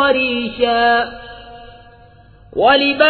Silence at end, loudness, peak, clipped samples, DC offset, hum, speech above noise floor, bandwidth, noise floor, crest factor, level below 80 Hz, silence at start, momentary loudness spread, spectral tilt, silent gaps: 0 s; -15 LUFS; 0 dBFS; under 0.1%; under 0.1%; none; 30 dB; 4.6 kHz; -44 dBFS; 16 dB; -46 dBFS; 0 s; 22 LU; -6.5 dB/octave; none